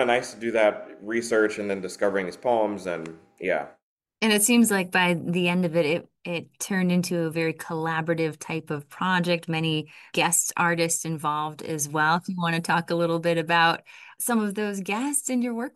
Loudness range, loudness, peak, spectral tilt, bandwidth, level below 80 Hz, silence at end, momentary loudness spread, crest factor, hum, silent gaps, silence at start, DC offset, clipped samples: 4 LU; -25 LUFS; -6 dBFS; -4 dB/octave; 13 kHz; -70 dBFS; 0.05 s; 10 LU; 18 dB; none; 3.83-3.97 s; 0 s; under 0.1%; under 0.1%